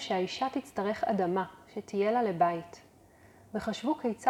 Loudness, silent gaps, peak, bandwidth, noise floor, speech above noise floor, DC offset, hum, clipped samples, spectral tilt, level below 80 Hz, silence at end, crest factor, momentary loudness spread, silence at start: -32 LUFS; none; -12 dBFS; 14 kHz; -58 dBFS; 28 dB; under 0.1%; none; under 0.1%; -5.5 dB/octave; -66 dBFS; 0 s; 20 dB; 11 LU; 0 s